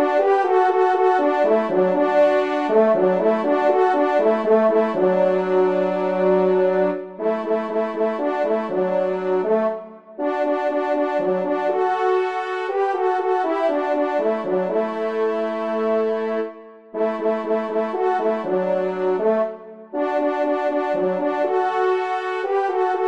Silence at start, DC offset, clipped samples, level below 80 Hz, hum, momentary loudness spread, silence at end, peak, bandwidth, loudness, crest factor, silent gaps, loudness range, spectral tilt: 0 s; 0.2%; under 0.1%; -72 dBFS; none; 7 LU; 0 s; -4 dBFS; 7.6 kHz; -20 LUFS; 14 dB; none; 5 LU; -7.5 dB/octave